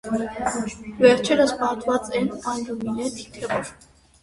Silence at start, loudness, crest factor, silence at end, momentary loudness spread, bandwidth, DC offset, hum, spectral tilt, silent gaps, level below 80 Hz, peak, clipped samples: 0.05 s; -23 LUFS; 22 dB; 0.5 s; 13 LU; 11.5 kHz; under 0.1%; none; -4.5 dB/octave; none; -52 dBFS; -2 dBFS; under 0.1%